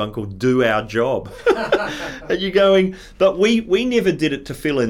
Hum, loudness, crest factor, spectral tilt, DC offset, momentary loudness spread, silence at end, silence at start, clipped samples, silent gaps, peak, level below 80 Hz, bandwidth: none; -18 LUFS; 14 dB; -5.5 dB/octave; under 0.1%; 9 LU; 0 s; 0 s; under 0.1%; none; -4 dBFS; -44 dBFS; 15 kHz